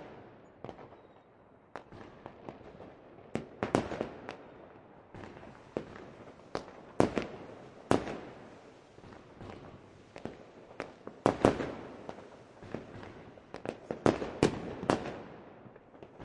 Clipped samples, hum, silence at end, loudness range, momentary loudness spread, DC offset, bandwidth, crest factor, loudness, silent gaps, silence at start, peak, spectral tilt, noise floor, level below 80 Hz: under 0.1%; none; 0 s; 8 LU; 22 LU; under 0.1%; 11 kHz; 30 dB; -35 LUFS; none; 0 s; -8 dBFS; -6 dB/octave; -60 dBFS; -60 dBFS